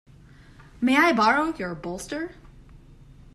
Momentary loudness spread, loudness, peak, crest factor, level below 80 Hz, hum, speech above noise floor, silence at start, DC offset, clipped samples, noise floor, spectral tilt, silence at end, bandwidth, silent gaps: 15 LU; -23 LUFS; -6 dBFS; 20 dB; -52 dBFS; none; 27 dB; 0.8 s; under 0.1%; under 0.1%; -50 dBFS; -4.5 dB/octave; 0.6 s; 13.5 kHz; none